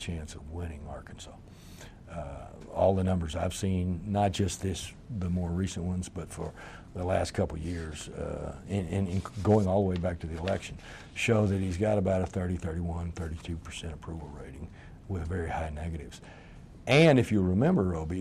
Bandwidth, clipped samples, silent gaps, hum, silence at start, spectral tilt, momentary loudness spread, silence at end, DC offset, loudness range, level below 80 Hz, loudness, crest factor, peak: 14 kHz; under 0.1%; none; none; 0 s; -6.5 dB/octave; 19 LU; 0 s; under 0.1%; 8 LU; -46 dBFS; -30 LUFS; 18 dB; -12 dBFS